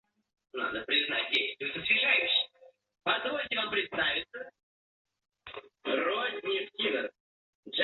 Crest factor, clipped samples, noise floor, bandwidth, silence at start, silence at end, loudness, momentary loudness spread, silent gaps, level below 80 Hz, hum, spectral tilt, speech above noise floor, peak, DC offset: 20 dB; under 0.1%; -61 dBFS; 7.2 kHz; 0.55 s; 0 s; -29 LUFS; 18 LU; 4.63-5.05 s, 7.20-7.63 s; -70 dBFS; none; -4 dB/octave; 30 dB; -14 dBFS; under 0.1%